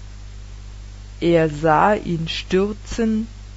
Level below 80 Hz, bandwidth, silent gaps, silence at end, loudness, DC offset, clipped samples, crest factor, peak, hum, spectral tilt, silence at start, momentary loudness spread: -36 dBFS; 8 kHz; none; 0 s; -20 LUFS; under 0.1%; under 0.1%; 18 dB; -2 dBFS; 50 Hz at -35 dBFS; -6 dB/octave; 0 s; 23 LU